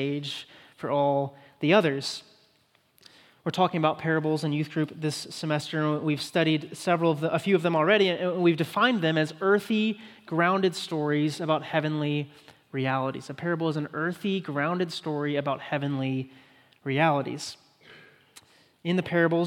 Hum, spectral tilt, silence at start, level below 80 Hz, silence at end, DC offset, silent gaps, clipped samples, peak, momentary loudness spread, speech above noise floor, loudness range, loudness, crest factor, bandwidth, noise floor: none; -6 dB/octave; 0 s; -76 dBFS; 0 s; under 0.1%; none; under 0.1%; -6 dBFS; 11 LU; 40 dB; 5 LU; -27 LUFS; 20 dB; 16.5 kHz; -66 dBFS